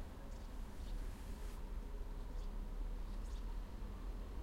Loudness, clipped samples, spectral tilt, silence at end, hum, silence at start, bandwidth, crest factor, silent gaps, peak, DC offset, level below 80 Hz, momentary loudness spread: -51 LUFS; under 0.1%; -6 dB/octave; 0 s; none; 0 s; 15.5 kHz; 10 dB; none; -34 dBFS; under 0.1%; -46 dBFS; 3 LU